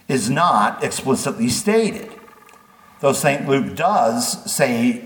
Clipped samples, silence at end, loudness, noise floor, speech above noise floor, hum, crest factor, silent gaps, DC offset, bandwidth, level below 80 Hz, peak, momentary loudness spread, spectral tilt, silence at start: under 0.1%; 0 s; -18 LUFS; -48 dBFS; 29 dB; none; 16 dB; none; under 0.1%; 19 kHz; -60 dBFS; -2 dBFS; 6 LU; -4 dB/octave; 0.1 s